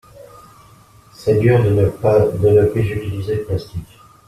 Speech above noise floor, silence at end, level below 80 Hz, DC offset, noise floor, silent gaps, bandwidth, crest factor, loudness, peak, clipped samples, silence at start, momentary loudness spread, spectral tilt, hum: 31 dB; 0.45 s; -42 dBFS; under 0.1%; -47 dBFS; none; 14 kHz; 16 dB; -16 LUFS; -2 dBFS; under 0.1%; 0.2 s; 11 LU; -8.5 dB/octave; none